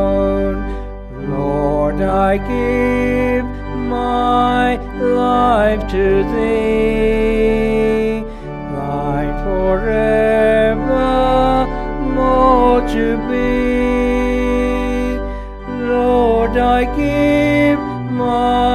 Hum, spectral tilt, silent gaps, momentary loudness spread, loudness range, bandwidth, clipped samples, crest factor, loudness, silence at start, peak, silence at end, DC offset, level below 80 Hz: none; -7 dB/octave; none; 9 LU; 3 LU; 13 kHz; under 0.1%; 14 dB; -15 LUFS; 0 s; 0 dBFS; 0 s; under 0.1%; -26 dBFS